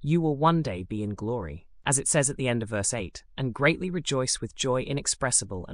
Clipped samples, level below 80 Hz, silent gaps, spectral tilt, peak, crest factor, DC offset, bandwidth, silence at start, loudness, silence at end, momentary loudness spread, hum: under 0.1%; -50 dBFS; none; -4 dB/octave; -10 dBFS; 18 dB; under 0.1%; 13 kHz; 0 s; -27 LUFS; 0 s; 10 LU; none